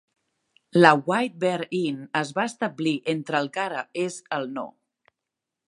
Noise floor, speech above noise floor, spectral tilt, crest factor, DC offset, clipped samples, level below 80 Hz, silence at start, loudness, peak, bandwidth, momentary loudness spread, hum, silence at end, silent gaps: -86 dBFS; 62 dB; -5.5 dB/octave; 26 dB; under 0.1%; under 0.1%; -78 dBFS; 0.75 s; -24 LUFS; 0 dBFS; 11.5 kHz; 13 LU; none; 1.05 s; none